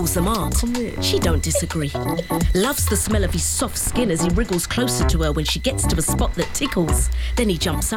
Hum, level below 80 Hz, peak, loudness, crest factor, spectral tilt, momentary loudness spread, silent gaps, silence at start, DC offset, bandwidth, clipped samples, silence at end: none; -26 dBFS; -8 dBFS; -20 LUFS; 10 dB; -4 dB/octave; 3 LU; none; 0 s; under 0.1%; 17 kHz; under 0.1%; 0 s